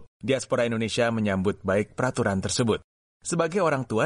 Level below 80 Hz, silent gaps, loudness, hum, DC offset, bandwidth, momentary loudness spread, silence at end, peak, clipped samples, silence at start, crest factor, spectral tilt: -56 dBFS; 0.08-0.20 s, 2.84-3.20 s; -26 LUFS; none; under 0.1%; 11.5 kHz; 4 LU; 0 s; -10 dBFS; under 0.1%; 0 s; 16 dB; -5 dB/octave